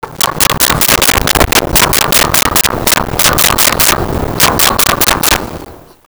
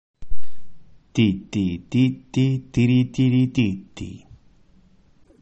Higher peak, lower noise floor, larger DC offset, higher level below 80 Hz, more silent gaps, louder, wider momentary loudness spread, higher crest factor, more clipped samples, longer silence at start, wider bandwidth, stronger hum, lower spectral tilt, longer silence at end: first, 0 dBFS vs -6 dBFS; second, -32 dBFS vs -54 dBFS; neither; first, -24 dBFS vs -42 dBFS; neither; first, -8 LUFS vs -21 LUFS; second, 5 LU vs 13 LU; about the same, 10 dB vs 14 dB; neither; about the same, 0.05 s vs 0.15 s; first, over 20 kHz vs 8.2 kHz; neither; second, -2 dB/octave vs -7.5 dB/octave; first, 0.3 s vs 0 s